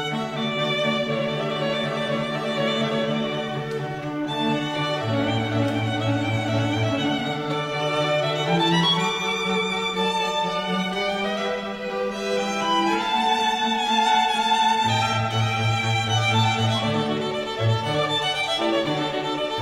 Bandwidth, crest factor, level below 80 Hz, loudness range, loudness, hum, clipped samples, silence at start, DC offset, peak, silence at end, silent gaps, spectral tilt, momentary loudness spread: 15.5 kHz; 16 dB; -54 dBFS; 4 LU; -23 LUFS; none; under 0.1%; 0 s; under 0.1%; -8 dBFS; 0 s; none; -5 dB/octave; 6 LU